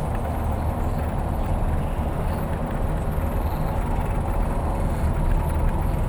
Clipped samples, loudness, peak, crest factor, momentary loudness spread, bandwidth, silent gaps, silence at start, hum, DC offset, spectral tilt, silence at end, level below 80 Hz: under 0.1%; -26 LUFS; -10 dBFS; 12 dB; 2 LU; over 20 kHz; none; 0 s; none; under 0.1%; -8 dB/octave; 0 s; -26 dBFS